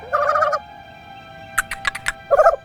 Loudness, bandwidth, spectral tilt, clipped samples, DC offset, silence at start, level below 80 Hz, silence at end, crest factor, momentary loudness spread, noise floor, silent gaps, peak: -20 LUFS; 17 kHz; -2 dB/octave; under 0.1%; under 0.1%; 0 s; -46 dBFS; 0.05 s; 20 dB; 24 LU; -40 dBFS; none; 0 dBFS